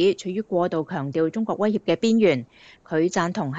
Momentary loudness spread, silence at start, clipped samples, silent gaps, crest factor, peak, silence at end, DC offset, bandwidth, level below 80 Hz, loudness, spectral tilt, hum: 9 LU; 0 s; under 0.1%; none; 16 dB; -8 dBFS; 0 s; under 0.1%; 8 kHz; -66 dBFS; -23 LUFS; -6 dB/octave; none